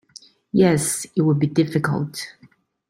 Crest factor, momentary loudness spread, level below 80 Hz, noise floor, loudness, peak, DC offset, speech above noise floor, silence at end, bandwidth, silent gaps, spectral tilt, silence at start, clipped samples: 18 dB; 12 LU; -58 dBFS; -48 dBFS; -20 LUFS; -4 dBFS; under 0.1%; 29 dB; 0.6 s; 16.5 kHz; none; -5.5 dB/octave; 0.55 s; under 0.1%